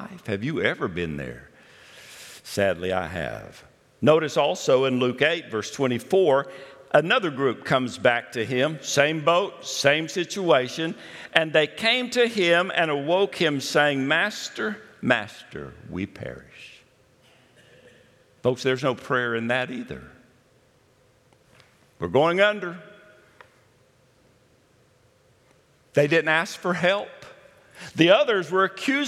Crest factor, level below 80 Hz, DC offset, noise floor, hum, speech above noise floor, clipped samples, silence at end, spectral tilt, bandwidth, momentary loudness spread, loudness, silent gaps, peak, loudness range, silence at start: 24 dB; -62 dBFS; under 0.1%; -60 dBFS; none; 37 dB; under 0.1%; 0 s; -4.5 dB/octave; 15 kHz; 18 LU; -23 LUFS; none; 0 dBFS; 9 LU; 0 s